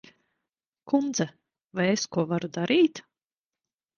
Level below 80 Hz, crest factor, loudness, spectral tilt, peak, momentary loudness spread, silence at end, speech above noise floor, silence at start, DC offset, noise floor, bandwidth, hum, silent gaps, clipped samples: -70 dBFS; 18 dB; -26 LUFS; -5 dB/octave; -10 dBFS; 10 LU; 1 s; over 65 dB; 0.85 s; under 0.1%; under -90 dBFS; 7.4 kHz; none; 1.66-1.70 s; under 0.1%